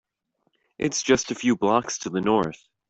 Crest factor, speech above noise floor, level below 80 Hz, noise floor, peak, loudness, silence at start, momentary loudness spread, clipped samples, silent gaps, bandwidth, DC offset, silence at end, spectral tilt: 22 dB; 51 dB; -58 dBFS; -74 dBFS; -4 dBFS; -24 LUFS; 0.8 s; 7 LU; under 0.1%; none; 8.2 kHz; under 0.1%; 0.35 s; -4 dB/octave